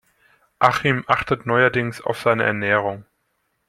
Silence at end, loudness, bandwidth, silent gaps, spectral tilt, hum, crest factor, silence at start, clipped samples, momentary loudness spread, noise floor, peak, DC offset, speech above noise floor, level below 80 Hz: 0.65 s; -20 LUFS; 15 kHz; none; -6 dB/octave; none; 20 dB; 0.6 s; under 0.1%; 7 LU; -71 dBFS; -2 dBFS; under 0.1%; 51 dB; -54 dBFS